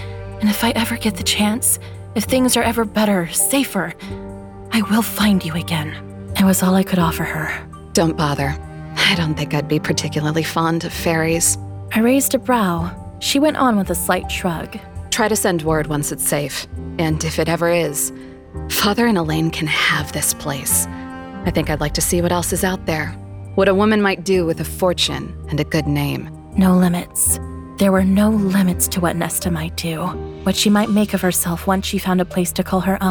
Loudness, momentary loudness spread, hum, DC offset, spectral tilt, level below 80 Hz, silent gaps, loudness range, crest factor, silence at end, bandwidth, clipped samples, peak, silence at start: -18 LUFS; 10 LU; none; under 0.1%; -4 dB/octave; -36 dBFS; none; 2 LU; 18 dB; 0 s; over 20 kHz; under 0.1%; -2 dBFS; 0 s